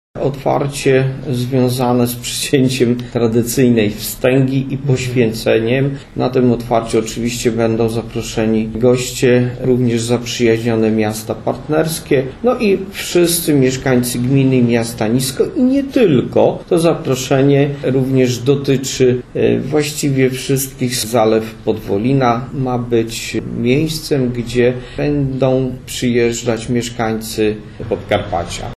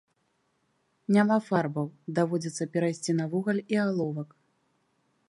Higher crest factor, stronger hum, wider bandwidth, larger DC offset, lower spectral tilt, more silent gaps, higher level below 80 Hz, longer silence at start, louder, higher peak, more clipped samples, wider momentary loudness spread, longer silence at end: about the same, 14 dB vs 18 dB; neither; first, 14 kHz vs 11.5 kHz; neither; about the same, -5.5 dB/octave vs -6.5 dB/octave; neither; first, -38 dBFS vs -76 dBFS; second, 0.15 s vs 1.1 s; first, -15 LUFS vs -28 LUFS; first, 0 dBFS vs -12 dBFS; neither; second, 6 LU vs 10 LU; second, 0 s vs 1.05 s